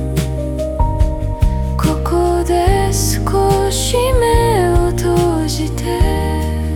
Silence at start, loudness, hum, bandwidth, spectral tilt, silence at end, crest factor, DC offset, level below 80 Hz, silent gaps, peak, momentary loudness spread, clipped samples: 0 s; -16 LUFS; none; 18 kHz; -5.5 dB/octave; 0 s; 14 dB; under 0.1%; -20 dBFS; none; 0 dBFS; 6 LU; under 0.1%